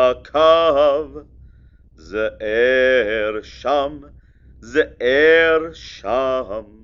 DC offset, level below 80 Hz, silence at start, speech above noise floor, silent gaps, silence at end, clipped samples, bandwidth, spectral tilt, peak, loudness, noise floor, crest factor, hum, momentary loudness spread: under 0.1%; -44 dBFS; 0 s; 30 dB; none; 0.2 s; under 0.1%; 7.2 kHz; -4.5 dB/octave; -2 dBFS; -17 LUFS; -47 dBFS; 16 dB; none; 14 LU